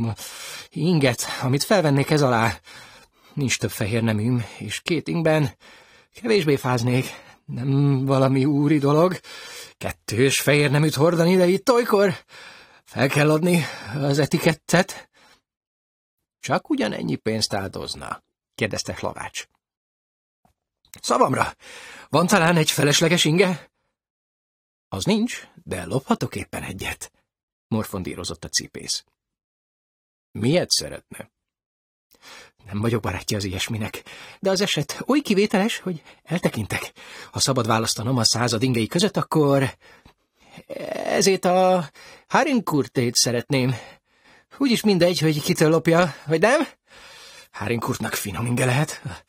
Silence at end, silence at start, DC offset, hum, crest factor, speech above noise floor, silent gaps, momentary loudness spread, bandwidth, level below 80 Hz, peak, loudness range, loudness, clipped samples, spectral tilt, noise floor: 0.1 s; 0 s; under 0.1%; none; 20 dB; 43 dB; 15.57-15.61 s, 15.67-16.17 s, 19.77-20.43 s, 24.10-24.91 s, 27.43-27.70 s, 29.44-30.34 s, 31.66-32.10 s; 16 LU; 16.5 kHz; -54 dBFS; -2 dBFS; 8 LU; -21 LUFS; under 0.1%; -4.5 dB/octave; -65 dBFS